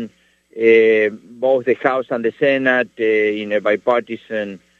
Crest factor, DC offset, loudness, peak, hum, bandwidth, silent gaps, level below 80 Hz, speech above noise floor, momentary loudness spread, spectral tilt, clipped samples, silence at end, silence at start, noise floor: 16 dB; under 0.1%; -17 LUFS; 0 dBFS; none; 6.6 kHz; none; -68 dBFS; 31 dB; 12 LU; -6.5 dB/octave; under 0.1%; 0.25 s; 0 s; -48 dBFS